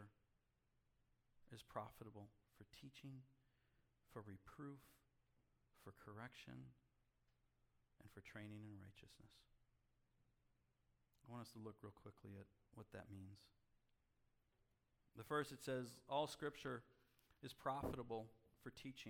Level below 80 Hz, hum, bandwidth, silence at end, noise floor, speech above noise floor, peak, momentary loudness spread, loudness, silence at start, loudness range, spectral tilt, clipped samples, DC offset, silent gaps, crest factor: -78 dBFS; none; 18 kHz; 0 s; -85 dBFS; 31 dB; -32 dBFS; 19 LU; -54 LUFS; 0 s; 14 LU; -5.5 dB/octave; under 0.1%; under 0.1%; none; 24 dB